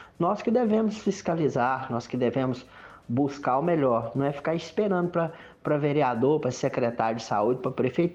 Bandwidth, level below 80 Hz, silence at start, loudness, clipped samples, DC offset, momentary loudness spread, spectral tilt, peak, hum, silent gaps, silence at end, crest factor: 8.4 kHz; -62 dBFS; 0 s; -26 LUFS; under 0.1%; under 0.1%; 6 LU; -7 dB/octave; -10 dBFS; none; none; 0 s; 16 dB